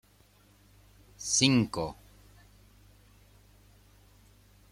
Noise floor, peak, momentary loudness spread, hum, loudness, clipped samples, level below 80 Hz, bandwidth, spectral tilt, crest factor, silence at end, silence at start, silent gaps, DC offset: -62 dBFS; -8 dBFS; 17 LU; 50 Hz at -60 dBFS; -27 LUFS; under 0.1%; -60 dBFS; 16 kHz; -3.5 dB/octave; 26 dB; 2.8 s; 1.2 s; none; under 0.1%